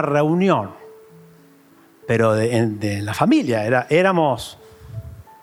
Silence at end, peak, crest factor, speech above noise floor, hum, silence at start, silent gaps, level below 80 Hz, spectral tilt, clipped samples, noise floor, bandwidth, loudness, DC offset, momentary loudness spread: 0.2 s; -4 dBFS; 16 dB; 33 dB; none; 0 s; none; -54 dBFS; -6.5 dB/octave; under 0.1%; -51 dBFS; 16 kHz; -19 LUFS; under 0.1%; 19 LU